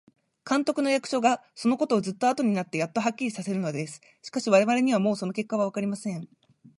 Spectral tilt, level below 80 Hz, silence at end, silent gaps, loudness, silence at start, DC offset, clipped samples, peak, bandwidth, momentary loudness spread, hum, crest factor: -5.5 dB/octave; -76 dBFS; 0.5 s; none; -26 LUFS; 0.45 s; under 0.1%; under 0.1%; -8 dBFS; 11.5 kHz; 12 LU; none; 20 dB